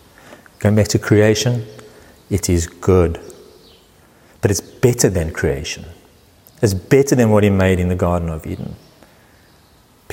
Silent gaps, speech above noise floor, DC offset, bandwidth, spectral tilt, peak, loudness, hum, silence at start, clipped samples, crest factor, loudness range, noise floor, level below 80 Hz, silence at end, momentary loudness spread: none; 35 dB; under 0.1%; 16.5 kHz; -5.5 dB/octave; 0 dBFS; -17 LUFS; none; 0.3 s; under 0.1%; 16 dB; 4 LU; -51 dBFS; -36 dBFS; 1.35 s; 14 LU